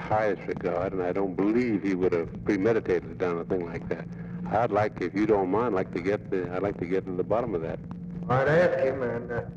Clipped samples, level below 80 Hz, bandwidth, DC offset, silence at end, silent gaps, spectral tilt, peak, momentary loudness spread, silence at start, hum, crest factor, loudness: under 0.1%; -52 dBFS; 7.8 kHz; under 0.1%; 0 s; none; -8.5 dB/octave; -12 dBFS; 9 LU; 0 s; none; 16 dB; -27 LUFS